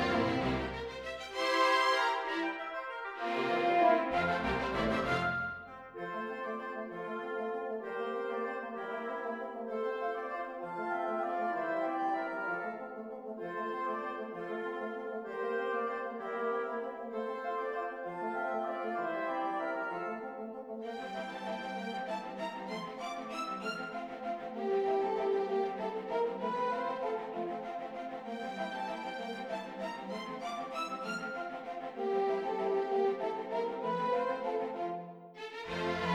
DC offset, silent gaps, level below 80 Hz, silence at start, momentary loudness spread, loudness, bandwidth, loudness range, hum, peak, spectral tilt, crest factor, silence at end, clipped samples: under 0.1%; none; -62 dBFS; 0 s; 9 LU; -36 LUFS; 14 kHz; 7 LU; none; -16 dBFS; -5 dB/octave; 20 dB; 0 s; under 0.1%